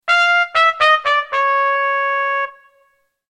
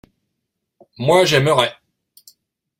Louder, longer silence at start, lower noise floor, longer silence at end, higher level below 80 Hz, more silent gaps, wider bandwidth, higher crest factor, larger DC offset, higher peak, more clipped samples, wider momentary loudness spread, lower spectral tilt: about the same, -15 LUFS vs -16 LUFS; second, 0.05 s vs 1 s; second, -60 dBFS vs -77 dBFS; second, 0.8 s vs 1.1 s; second, -64 dBFS vs -56 dBFS; neither; second, 11 kHz vs 16.5 kHz; about the same, 16 dB vs 20 dB; neither; about the same, -2 dBFS vs -2 dBFS; neither; second, 6 LU vs 9 LU; second, 1 dB/octave vs -4.5 dB/octave